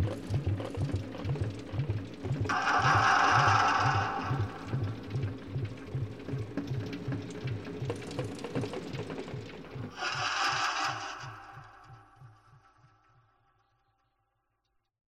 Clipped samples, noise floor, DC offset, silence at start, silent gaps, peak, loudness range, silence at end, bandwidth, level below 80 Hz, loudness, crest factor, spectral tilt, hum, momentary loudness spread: under 0.1%; -79 dBFS; under 0.1%; 0 s; none; -12 dBFS; 10 LU; 2.5 s; 12 kHz; -56 dBFS; -31 LUFS; 22 dB; -5 dB/octave; none; 16 LU